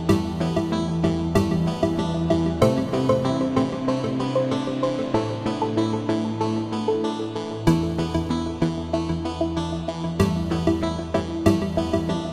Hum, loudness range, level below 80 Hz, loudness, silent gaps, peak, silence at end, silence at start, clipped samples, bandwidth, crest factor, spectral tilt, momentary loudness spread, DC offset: none; 3 LU; -40 dBFS; -24 LUFS; none; -4 dBFS; 0 s; 0 s; under 0.1%; 15 kHz; 18 dB; -7 dB/octave; 5 LU; under 0.1%